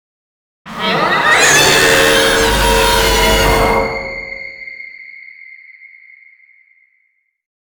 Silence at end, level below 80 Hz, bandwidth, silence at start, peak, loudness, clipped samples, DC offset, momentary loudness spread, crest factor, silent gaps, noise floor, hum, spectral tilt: 1.75 s; -26 dBFS; over 20 kHz; 0.65 s; 0 dBFS; -10 LUFS; under 0.1%; under 0.1%; 22 LU; 14 dB; none; -62 dBFS; none; -2 dB/octave